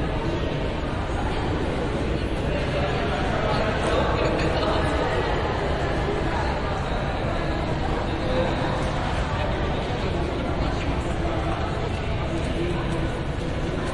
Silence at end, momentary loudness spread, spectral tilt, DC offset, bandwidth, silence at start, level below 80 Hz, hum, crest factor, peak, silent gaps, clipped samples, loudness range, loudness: 0 s; 4 LU; -6.5 dB/octave; under 0.1%; 11.5 kHz; 0 s; -30 dBFS; none; 14 dB; -10 dBFS; none; under 0.1%; 3 LU; -25 LUFS